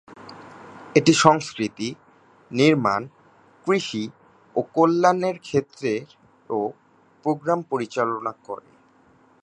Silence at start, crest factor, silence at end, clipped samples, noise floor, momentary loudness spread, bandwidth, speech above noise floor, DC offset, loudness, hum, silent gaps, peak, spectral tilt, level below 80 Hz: 0.1 s; 24 dB; 0.85 s; under 0.1%; -57 dBFS; 19 LU; 10.5 kHz; 35 dB; under 0.1%; -22 LUFS; none; none; 0 dBFS; -5 dB/octave; -64 dBFS